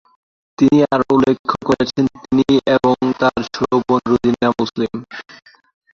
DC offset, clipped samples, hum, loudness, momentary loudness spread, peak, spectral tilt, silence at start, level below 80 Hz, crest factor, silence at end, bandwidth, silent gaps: under 0.1%; under 0.1%; none; -16 LUFS; 8 LU; -2 dBFS; -6.5 dB/octave; 0.6 s; -48 dBFS; 14 dB; 0.75 s; 7.4 kHz; 1.39-1.44 s